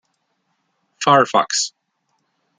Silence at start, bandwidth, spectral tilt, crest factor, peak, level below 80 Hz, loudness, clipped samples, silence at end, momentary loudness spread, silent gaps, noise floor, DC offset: 1 s; 10 kHz; -2.5 dB/octave; 20 dB; -2 dBFS; -66 dBFS; -17 LUFS; under 0.1%; 0.9 s; 9 LU; none; -70 dBFS; under 0.1%